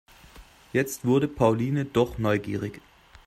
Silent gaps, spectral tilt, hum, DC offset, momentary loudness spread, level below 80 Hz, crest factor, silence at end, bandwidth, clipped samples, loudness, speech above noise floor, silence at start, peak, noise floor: none; -6.5 dB/octave; none; under 0.1%; 9 LU; -52 dBFS; 20 dB; 0.45 s; 16 kHz; under 0.1%; -26 LUFS; 26 dB; 0.35 s; -6 dBFS; -50 dBFS